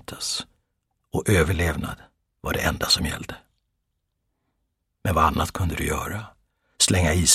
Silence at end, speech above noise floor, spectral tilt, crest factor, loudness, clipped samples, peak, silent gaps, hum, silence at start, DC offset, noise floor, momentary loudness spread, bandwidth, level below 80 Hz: 0 s; 54 dB; -3.5 dB/octave; 22 dB; -23 LUFS; under 0.1%; -4 dBFS; none; none; 0.1 s; under 0.1%; -76 dBFS; 16 LU; 16 kHz; -38 dBFS